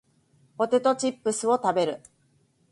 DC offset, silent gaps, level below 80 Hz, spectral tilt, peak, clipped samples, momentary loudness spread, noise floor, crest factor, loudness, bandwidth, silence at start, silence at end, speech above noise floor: under 0.1%; none; -72 dBFS; -4 dB/octave; -10 dBFS; under 0.1%; 7 LU; -66 dBFS; 16 dB; -25 LUFS; 11.5 kHz; 0.6 s; 0.75 s; 41 dB